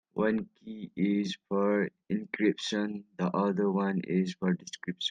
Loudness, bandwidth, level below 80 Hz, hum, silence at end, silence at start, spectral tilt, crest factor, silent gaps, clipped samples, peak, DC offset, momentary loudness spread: -31 LUFS; 9.4 kHz; -74 dBFS; none; 0 s; 0.15 s; -6 dB/octave; 16 dB; none; under 0.1%; -14 dBFS; under 0.1%; 8 LU